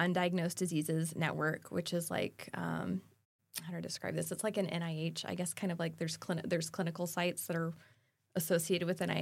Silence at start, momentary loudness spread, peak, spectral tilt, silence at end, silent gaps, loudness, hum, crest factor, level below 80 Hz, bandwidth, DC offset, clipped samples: 0 s; 8 LU; -18 dBFS; -5 dB/octave; 0 s; 3.25-3.39 s; -37 LUFS; none; 20 dB; -78 dBFS; 16.5 kHz; under 0.1%; under 0.1%